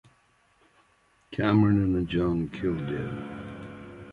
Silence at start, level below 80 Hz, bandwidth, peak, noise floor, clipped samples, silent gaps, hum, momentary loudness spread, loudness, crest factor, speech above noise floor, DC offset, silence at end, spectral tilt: 1.3 s; -48 dBFS; 6.8 kHz; -10 dBFS; -65 dBFS; under 0.1%; none; none; 19 LU; -27 LUFS; 18 dB; 39 dB; under 0.1%; 0 s; -9 dB/octave